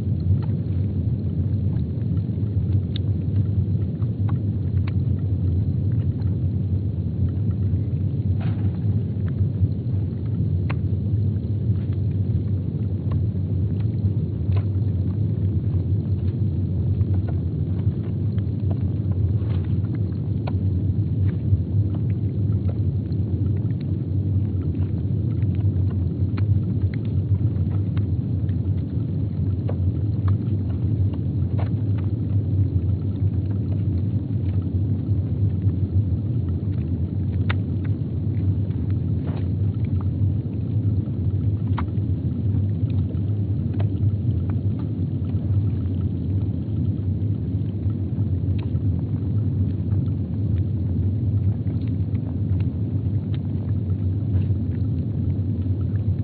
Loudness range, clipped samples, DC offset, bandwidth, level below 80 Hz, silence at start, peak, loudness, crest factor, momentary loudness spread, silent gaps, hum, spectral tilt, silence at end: 1 LU; under 0.1%; under 0.1%; 4.3 kHz; -38 dBFS; 0 s; -8 dBFS; -24 LUFS; 14 dB; 3 LU; none; none; -10.5 dB/octave; 0 s